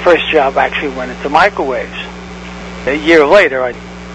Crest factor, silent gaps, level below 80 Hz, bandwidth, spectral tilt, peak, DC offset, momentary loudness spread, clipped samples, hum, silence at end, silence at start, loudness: 12 dB; none; -36 dBFS; 11 kHz; -5 dB/octave; 0 dBFS; under 0.1%; 19 LU; 0.6%; 60 Hz at -35 dBFS; 0 s; 0 s; -12 LUFS